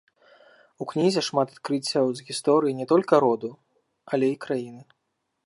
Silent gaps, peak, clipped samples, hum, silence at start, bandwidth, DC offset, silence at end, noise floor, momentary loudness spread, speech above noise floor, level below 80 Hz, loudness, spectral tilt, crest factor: none; -4 dBFS; under 0.1%; none; 0.8 s; 11.5 kHz; under 0.1%; 0.65 s; -77 dBFS; 11 LU; 54 dB; -78 dBFS; -24 LUFS; -5.5 dB/octave; 20 dB